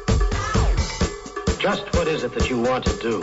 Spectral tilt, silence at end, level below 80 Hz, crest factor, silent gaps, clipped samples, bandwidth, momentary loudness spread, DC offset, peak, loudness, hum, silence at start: -5 dB/octave; 0 s; -26 dBFS; 14 dB; none; under 0.1%; 8 kHz; 5 LU; under 0.1%; -8 dBFS; -23 LUFS; none; 0 s